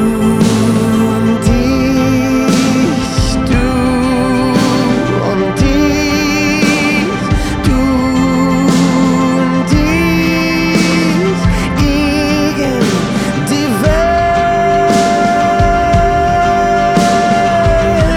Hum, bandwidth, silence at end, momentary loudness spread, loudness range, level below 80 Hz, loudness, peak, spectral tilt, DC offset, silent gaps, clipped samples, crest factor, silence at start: none; 16 kHz; 0 s; 3 LU; 2 LU; -22 dBFS; -12 LUFS; 0 dBFS; -5.5 dB/octave; under 0.1%; none; under 0.1%; 10 dB; 0 s